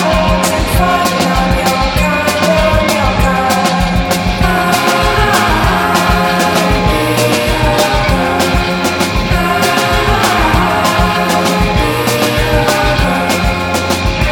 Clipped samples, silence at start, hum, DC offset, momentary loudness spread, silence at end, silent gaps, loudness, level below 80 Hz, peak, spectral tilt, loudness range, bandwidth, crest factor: under 0.1%; 0 s; none; under 0.1%; 3 LU; 0 s; none; -11 LUFS; -20 dBFS; 0 dBFS; -4.5 dB/octave; 1 LU; 19.5 kHz; 12 dB